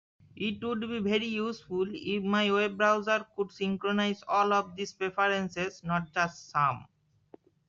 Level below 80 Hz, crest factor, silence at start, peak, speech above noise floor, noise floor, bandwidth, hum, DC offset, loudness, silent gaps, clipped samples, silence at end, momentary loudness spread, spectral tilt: -68 dBFS; 18 dB; 0.35 s; -12 dBFS; 29 dB; -58 dBFS; 7.4 kHz; none; under 0.1%; -30 LUFS; none; under 0.1%; 0.85 s; 8 LU; -3 dB/octave